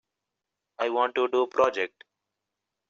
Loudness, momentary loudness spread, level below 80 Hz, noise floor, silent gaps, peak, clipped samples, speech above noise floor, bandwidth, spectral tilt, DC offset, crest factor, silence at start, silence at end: -26 LUFS; 8 LU; -72 dBFS; -86 dBFS; none; -8 dBFS; under 0.1%; 60 dB; 7.4 kHz; -1 dB/octave; under 0.1%; 20 dB; 0.8 s; 1 s